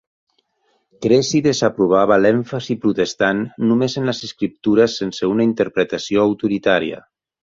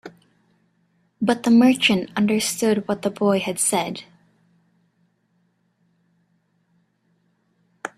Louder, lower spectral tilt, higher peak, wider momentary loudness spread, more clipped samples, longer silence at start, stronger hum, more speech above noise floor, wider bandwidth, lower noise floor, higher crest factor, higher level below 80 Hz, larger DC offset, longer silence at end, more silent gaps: about the same, -18 LUFS vs -20 LUFS; first, -5.5 dB/octave vs -4 dB/octave; about the same, -2 dBFS vs -4 dBFS; about the same, 8 LU vs 10 LU; neither; first, 1 s vs 0.05 s; neither; about the same, 48 dB vs 47 dB; second, 7.8 kHz vs 14.5 kHz; about the same, -65 dBFS vs -67 dBFS; about the same, 16 dB vs 20 dB; first, -54 dBFS vs -66 dBFS; neither; first, 0.55 s vs 0.1 s; neither